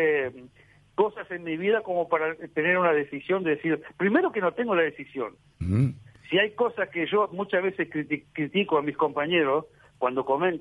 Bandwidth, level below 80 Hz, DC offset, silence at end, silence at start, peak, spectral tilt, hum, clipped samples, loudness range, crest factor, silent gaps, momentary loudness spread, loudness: 10.5 kHz; -58 dBFS; under 0.1%; 0 s; 0 s; -8 dBFS; -8 dB/octave; none; under 0.1%; 2 LU; 18 dB; none; 9 LU; -26 LUFS